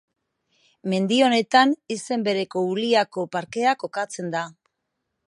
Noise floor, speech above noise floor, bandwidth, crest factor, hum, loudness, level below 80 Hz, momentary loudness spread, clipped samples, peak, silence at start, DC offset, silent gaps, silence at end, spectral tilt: -79 dBFS; 57 dB; 11.5 kHz; 20 dB; none; -22 LUFS; -74 dBFS; 11 LU; under 0.1%; -4 dBFS; 0.85 s; under 0.1%; none; 0.75 s; -4.5 dB/octave